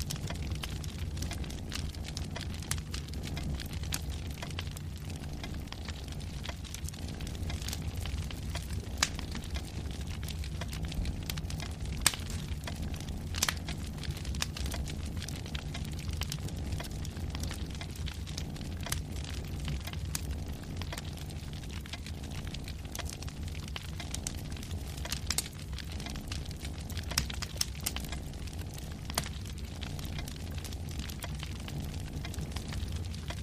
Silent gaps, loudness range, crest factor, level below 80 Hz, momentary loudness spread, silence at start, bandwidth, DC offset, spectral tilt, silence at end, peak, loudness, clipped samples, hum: none; 5 LU; 32 dB; -42 dBFS; 7 LU; 0 s; 15.5 kHz; under 0.1%; -3.5 dB/octave; 0 s; -6 dBFS; -38 LUFS; under 0.1%; none